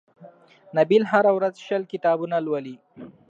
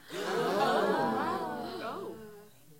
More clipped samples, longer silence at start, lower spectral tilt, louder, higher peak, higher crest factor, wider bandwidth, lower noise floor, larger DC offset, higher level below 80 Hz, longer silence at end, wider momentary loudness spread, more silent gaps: neither; first, 0.2 s vs 0.05 s; first, -7 dB/octave vs -5 dB/octave; first, -22 LUFS vs -32 LUFS; first, -4 dBFS vs -14 dBFS; about the same, 18 dB vs 18 dB; second, 7.8 kHz vs 16.5 kHz; second, -49 dBFS vs -54 dBFS; neither; about the same, -76 dBFS vs -74 dBFS; first, 0.2 s vs 0.05 s; second, 11 LU vs 16 LU; neither